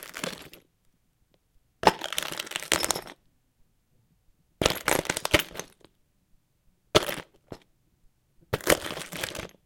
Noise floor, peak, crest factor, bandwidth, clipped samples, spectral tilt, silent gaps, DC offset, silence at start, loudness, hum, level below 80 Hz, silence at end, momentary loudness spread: -69 dBFS; 0 dBFS; 32 dB; 17 kHz; under 0.1%; -2.5 dB/octave; none; under 0.1%; 0 s; -27 LUFS; none; -52 dBFS; 0.2 s; 21 LU